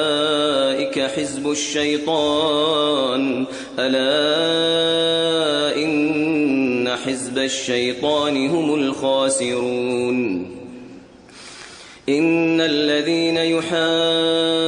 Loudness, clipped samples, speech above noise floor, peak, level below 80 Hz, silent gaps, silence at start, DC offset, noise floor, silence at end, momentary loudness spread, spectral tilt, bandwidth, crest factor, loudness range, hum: -19 LUFS; under 0.1%; 23 dB; -6 dBFS; -60 dBFS; none; 0 s; under 0.1%; -42 dBFS; 0 s; 7 LU; -3.5 dB/octave; 10.5 kHz; 12 dB; 4 LU; none